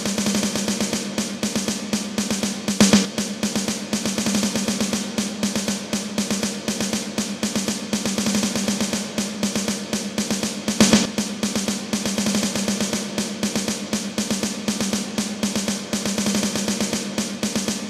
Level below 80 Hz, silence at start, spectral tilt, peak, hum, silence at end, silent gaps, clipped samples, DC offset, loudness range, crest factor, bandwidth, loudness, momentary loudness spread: -52 dBFS; 0 s; -3.5 dB/octave; 0 dBFS; none; 0 s; none; under 0.1%; under 0.1%; 3 LU; 22 dB; 15.5 kHz; -22 LUFS; 6 LU